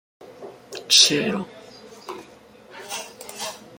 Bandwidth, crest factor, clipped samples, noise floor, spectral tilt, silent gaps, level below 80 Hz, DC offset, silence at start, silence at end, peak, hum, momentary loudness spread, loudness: 17 kHz; 24 dB; under 0.1%; -48 dBFS; -1 dB/octave; none; -68 dBFS; under 0.1%; 0.2 s; 0 s; -2 dBFS; none; 28 LU; -19 LUFS